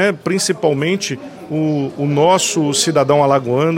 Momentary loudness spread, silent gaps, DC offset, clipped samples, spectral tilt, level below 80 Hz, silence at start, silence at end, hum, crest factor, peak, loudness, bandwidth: 8 LU; none; under 0.1%; under 0.1%; -4.5 dB/octave; -60 dBFS; 0 s; 0 s; none; 14 dB; -2 dBFS; -15 LUFS; 16.5 kHz